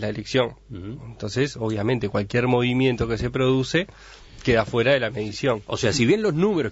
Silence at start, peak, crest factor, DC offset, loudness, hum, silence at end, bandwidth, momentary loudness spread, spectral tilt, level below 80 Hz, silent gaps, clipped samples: 0 s; -6 dBFS; 18 dB; under 0.1%; -22 LUFS; none; 0 s; 8 kHz; 10 LU; -5.5 dB/octave; -44 dBFS; none; under 0.1%